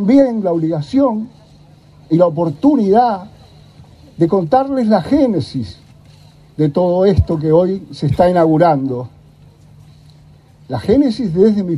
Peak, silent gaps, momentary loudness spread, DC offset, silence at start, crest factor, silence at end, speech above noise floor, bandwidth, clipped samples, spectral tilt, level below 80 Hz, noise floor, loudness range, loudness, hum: 0 dBFS; none; 13 LU; under 0.1%; 0 s; 14 dB; 0 s; 31 dB; 11 kHz; under 0.1%; -9 dB/octave; -38 dBFS; -44 dBFS; 3 LU; -14 LUFS; none